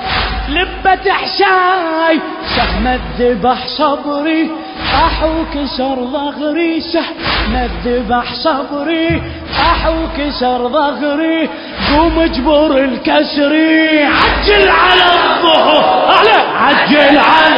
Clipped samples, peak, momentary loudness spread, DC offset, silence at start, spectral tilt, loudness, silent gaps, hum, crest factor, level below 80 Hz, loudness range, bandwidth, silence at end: under 0.1%; 0 dBFS; 9 LU; under 0.1%; 0 s; -6.5 dB/octave; -12 LUFS; none; none; 12 dB; -26 dBFS; 7 LU; 8 kHz; 0 s